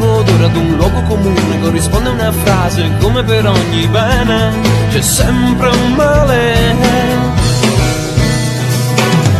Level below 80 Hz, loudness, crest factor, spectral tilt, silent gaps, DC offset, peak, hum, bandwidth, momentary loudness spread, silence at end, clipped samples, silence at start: -22 dBFS; -11 LUFS; 10 dB; -5.5 dB/octave; none; under 0.1%; 0 dBFS; none; 14.5 kHz; 3 LU; 0 s; under 0.1%; 0 s